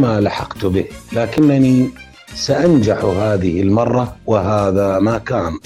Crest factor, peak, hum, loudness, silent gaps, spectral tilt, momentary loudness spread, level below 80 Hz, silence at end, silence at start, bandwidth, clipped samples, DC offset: 12 dB; -4 dBFS; none; -16 LUFS; none; -7 dB/octave; 8 LU; -40 dBFS; 0.05 s; 0 s; 14 kHz; under 0.1%; under 0.1%